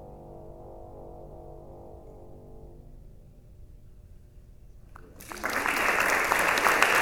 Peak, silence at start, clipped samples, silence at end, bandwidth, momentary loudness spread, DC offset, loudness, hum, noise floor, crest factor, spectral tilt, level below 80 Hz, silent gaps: -2 dBFS; 0 s; under 0.1%; 0 s; over 20 kHz; 27 LU; under 0.1%; -24 LUFS; none; -50 dBFS; 30 dB; -2 dB/octave; -50 dBFS; none